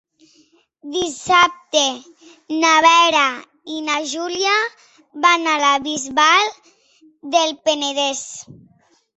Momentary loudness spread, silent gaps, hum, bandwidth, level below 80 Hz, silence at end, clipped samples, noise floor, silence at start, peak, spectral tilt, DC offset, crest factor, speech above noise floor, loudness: 14 LU; none; none; 8.4 kHz; -62 dBFS; 0.6 s; under 0.1%; -57 dBFS; 0.85 s; -2 dBFS; -0.5 dB/octave; under 0.1%; 18 dB; 40 dB; -17 LUFS